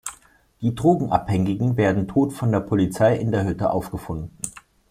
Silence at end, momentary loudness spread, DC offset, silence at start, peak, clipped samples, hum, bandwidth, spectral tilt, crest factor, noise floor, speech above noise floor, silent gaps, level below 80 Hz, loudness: 0.3 s; 13 LU; under 0.1%; 0.05 s; -4 dBFS; under 0.1%; none; 16 kHz; -7 dB/octave; 18 dB; -51 dBFS; 30 dB; none; -48 dBFS; -22 LUFS